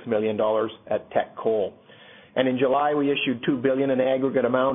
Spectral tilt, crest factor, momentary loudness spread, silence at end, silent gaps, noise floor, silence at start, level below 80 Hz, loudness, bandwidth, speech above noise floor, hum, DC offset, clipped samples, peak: -10.5 dB/octave; 18 dB; 6 LU; 0 s; none; -49 dBFS; 0 s; -64 dBFS; -24 LUFS; 3.8 kHz; 26 dB; none; under 0.1%; under 0.1%; -6 dBFS